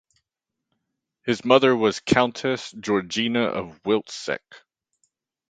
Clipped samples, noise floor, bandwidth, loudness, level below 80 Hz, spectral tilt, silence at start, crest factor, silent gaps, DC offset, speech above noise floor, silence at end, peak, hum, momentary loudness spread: under 0.1%; -85 dBFS; 9.4 kHz; -23 LUFS; -58 dBFS; -4.5 dB/octave; 1.25 s; 24 dB; none; under 0.1%; 62 dB; 0.9 s; -2 dBFS; none; 12 LU